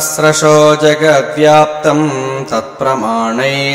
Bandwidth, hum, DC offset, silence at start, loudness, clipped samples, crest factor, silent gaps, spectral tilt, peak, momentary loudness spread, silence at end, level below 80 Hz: 16.5 kHz; none; under 0.1%; 0 s; -10 LUFS; under 0.1%; 10 dB; none; -4 dB/octave; 0 dBFS; 9 LU; 0 s; -52 dBFS